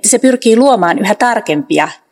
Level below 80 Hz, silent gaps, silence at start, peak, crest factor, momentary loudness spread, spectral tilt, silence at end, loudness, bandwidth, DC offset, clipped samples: -62 dBFS; none; 0.05 s; 0 dBFS; 10 dB; 6 LU; -3.5 dB/octave; 0.2 s; -11 LUFS; over 20 kHz; under 0.1%; 0.7%